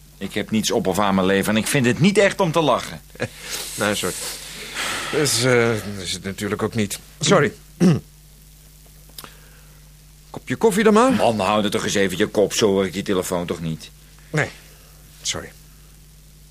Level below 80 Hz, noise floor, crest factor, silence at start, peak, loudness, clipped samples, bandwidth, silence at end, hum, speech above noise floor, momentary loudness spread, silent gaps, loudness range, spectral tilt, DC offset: -48 dBFS; -46 dBFS; 18 dB; 0.2 s; -2 dBFS; -20 LUFS; under 0.1%; 15.5 kHz; 1 s; none; 26 dB; 13 LU; none; 6 LU; -4.5 dB/octave; under 0.1%